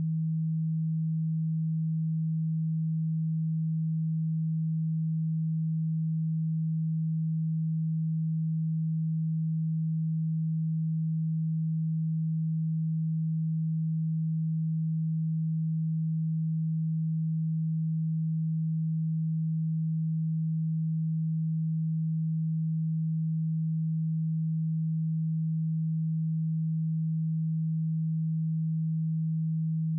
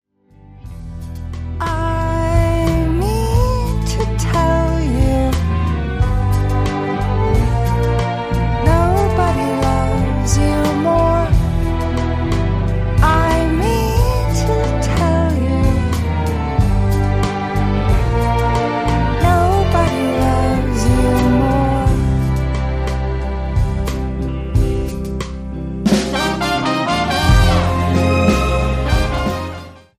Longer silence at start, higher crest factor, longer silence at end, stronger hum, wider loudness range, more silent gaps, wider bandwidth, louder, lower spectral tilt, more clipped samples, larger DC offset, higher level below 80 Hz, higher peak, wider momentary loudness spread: second, 0 s vs 0.5 s; second, 4 dB vs 14 dB; second, 0 s vs 0.2 s; neither; second, 0 LU vs 3 LU; neither; second, 0.2 kHz vs 15.5 kHz; second, -30 LUFS vs -17 LUFS; first, -30 dB/octave vs -6.5 dB/octave; neither; neither; second, under -90 dBFS vs -20 dBFS; second, -26 dBFS vs 0 dBFS; second, 0 LU vs 7 LU